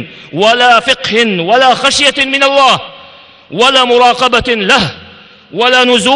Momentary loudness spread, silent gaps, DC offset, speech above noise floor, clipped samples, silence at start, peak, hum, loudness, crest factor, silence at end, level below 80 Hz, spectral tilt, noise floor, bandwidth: 8 LU; none; under 0.1%; 28 dB; 0.5%; 0 s; 0 dBFS; none; -8 LUFS; 10 dB; 0 s; -42 dBFS; -2.5 dB/octave; -37 dBFS; 12 kHz